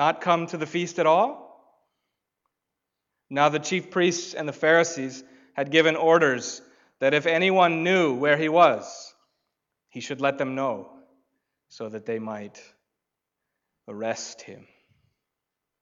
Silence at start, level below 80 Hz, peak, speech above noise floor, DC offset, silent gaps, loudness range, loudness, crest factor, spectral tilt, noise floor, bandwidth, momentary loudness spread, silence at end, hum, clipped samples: 0 s; -80 dBFS; -6 dBFS; 61 dB; under 0.1%; none; 15 LU; -23 LUFS; 20 dB; -4 dB/octave; -85 dBFS; 7.8 kHz; 19 LU; 1.25 s; none; under 0.1%